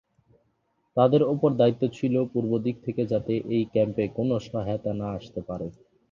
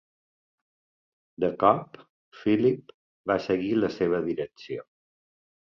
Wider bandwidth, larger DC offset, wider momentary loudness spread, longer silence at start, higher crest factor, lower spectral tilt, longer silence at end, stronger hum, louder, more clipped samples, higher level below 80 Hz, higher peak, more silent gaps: about the same, 7.2 kHz vs 6.8 kHz; neither; second, 12 LU vs 15 LU; second, 0.95 s vs 1.4 s; about the same, 20 dB vs 22 dB; about the same, -9 dB/octave vs -8 dB/octave; second, 0.4 s vs 0.95 s; neither; about the same, -26 LUFS vs -26 LUFS; neither; first, -56 dBFS vs -62 dBFS; about the same, -6 dBFS vs -6 dBFS; second, none vs 2.09-2.31 s, 2.94-3.24 s